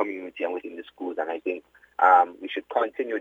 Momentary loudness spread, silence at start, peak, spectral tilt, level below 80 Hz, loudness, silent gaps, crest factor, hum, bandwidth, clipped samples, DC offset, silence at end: 18 LU; 0 s; -4 dBFS; -4.5 dB/octave; -74 dBFS; -25 LUFS; none; 22 dB; none; 7 kHz; under 0.1%; under 0.1%; 0 s